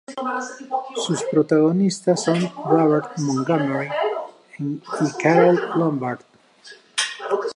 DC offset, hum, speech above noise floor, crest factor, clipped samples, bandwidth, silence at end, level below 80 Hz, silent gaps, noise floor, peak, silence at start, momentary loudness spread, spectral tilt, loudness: under 0.1%; none; 27 dB; 18 dB; under 0.1%; 11.5 kHz; 0.05 s; -72 dBFS; none; -47 dBFS; -2 dBFS; 0.1 s; 12 LU; -5.5 dB/octave; -21 LUFS